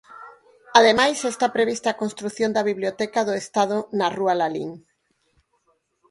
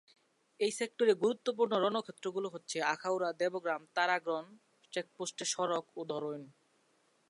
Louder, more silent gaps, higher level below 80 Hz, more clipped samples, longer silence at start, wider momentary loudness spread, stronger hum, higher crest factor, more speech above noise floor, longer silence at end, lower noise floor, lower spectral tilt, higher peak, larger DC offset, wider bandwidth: first, -21 LUFS vs -35 LUFS; neither; first, -66 dBFS vs under -90 dBFS; neither; second, 0.1 s vs 0.6 s; about the same, 12 LU vs 10 LU; neither; about the same, 22 dB vs 20 dB; first, 46 dB vs 38 dB; first, 1.3 s vs 0.8 s; second, -68 dBFS vs -73 dBFS; about the same, -3.5 dB/octave vs -3 dB/octave; first, 0 dBFS vs -16 dBFS; neither; about the same, 11.5 kHz vs 11.5 kHz